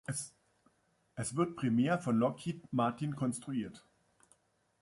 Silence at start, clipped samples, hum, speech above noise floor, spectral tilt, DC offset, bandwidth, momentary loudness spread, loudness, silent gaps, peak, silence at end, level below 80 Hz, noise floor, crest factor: 0.1 s; under 0.1%; none; 40 dB; -6 dB/octave; under 0.1%; 11.5 kHz; 11 LU; -35 LUFS; none; -18 dBFS; 1.05 s; -70 dBFS; -74 dBFS; 18 dB